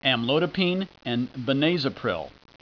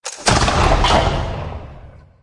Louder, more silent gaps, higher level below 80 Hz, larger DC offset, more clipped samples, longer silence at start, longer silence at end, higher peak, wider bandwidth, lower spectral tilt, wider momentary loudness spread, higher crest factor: second, -25 LUFS vs -16 LUFS; neither; second, -60 dBFS vs -24 dBFS; neither; neither; about the same, 0 s vs 0.05 s; about the same, 0.3 s vs 0.25 s; second, -8 dBFS vs -2 dBFS; second, 5.4 kHz vs 11.5 kHz; first, -7 dB/octave vs -4 dB/octave; second, 7 LU vs 15 LU; about the same, 18 dB vs 16 dB